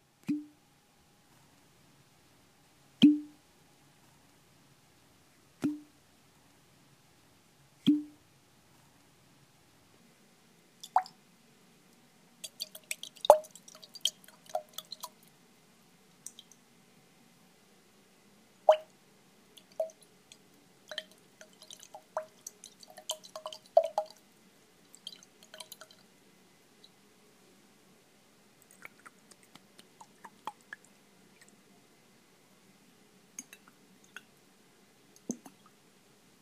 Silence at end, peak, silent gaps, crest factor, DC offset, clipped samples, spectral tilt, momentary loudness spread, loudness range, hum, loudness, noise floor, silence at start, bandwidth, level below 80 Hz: 1.05 s; -2 dBFS; none; 38 dB; under 0.1%; under 0.1%; -4 dB/octave; 29 LU; 22 LU; none; -33 LUFS; -65 dBFS; 0.3 s; 15.5 kHz; -82 dBFS